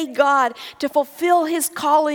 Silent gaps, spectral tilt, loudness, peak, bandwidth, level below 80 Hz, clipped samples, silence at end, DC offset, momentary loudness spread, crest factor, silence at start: none; -2 dB/octave; -19 LUFS; -2 dBFS; 19.5 kHz; -70 dBFS; under 0.1%; 0 s; under 0.1%; 6 LU; 16 dB; 0 s